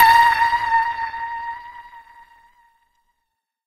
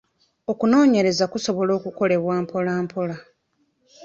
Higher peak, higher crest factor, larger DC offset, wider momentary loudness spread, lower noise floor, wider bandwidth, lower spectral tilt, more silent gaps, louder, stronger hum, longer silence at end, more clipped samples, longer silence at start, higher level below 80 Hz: first, 0 dBFS vs -6 dBFS; about the same, 20 dB vs 16 dB; neither; first, 23 LU vs 13 LU; first, -77 dBFS vs -69 dBFS; first, 15.5 kHz vs 7.8 kHz; second, -0.5 dB/octave vs -5.5 dB/octave; neither; first, -18 LUFS vs -21 LUFS; neither; first, 1.65 s vs 0 s; neither; second, 0 s vs 0.5 s; first, -52 dBFS vs -64 dBFS